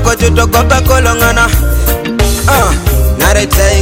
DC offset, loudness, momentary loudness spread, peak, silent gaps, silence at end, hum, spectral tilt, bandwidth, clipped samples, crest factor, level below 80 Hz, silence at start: under 0.1%; -9 LUFS; 4 LU; 0 dBFS; none; 0 s; none; -4.5 dB/octave; 17 kHz; 0.4%; 8 dB; -12 dBFS; 0 s